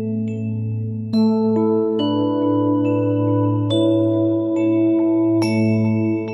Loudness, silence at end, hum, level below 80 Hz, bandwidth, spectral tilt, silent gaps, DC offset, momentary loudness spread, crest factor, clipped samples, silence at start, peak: -18 LUFS; 0 s; none; -62 dBFS; 11.5 kHz; -8.5 dB/octave; none; under 0.1%; 7 LU; 12 dB; under 0.1%; 0 s; -6 dBFS